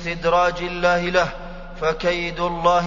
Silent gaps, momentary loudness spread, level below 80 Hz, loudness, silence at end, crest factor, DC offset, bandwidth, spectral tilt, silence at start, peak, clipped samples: none; 7 LU; -36 dBFS; -21 LUFS; 0 s; 18 dB; under 0.1%; 7.4 kHz; -5 dB/octave; 0 s; -4 dBFS; under 0.1%